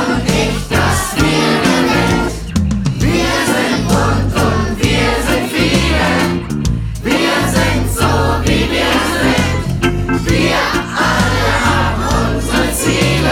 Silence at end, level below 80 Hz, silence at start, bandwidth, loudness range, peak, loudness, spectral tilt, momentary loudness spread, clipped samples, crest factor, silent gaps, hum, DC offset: 0 s; -24 dBFS; 0 s; 18 kHz; 1 LU; -2 dBFS; -14 LUFS; -4.5 dB/octave; 4 LU; under 0.1%; 12 dB; none; none; under 0.1%